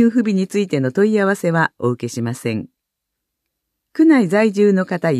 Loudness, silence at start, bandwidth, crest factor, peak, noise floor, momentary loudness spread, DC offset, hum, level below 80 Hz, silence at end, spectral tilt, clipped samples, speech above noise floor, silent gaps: -17 LUFS; 0 s; 13.5 kHz; 14 dB; -2 dBFS; -79 dBFS; 10 LU; under 0.1%; none; -66 dBFS; 0 s; -7 dB/octave; under 0.1%; 63 dB; none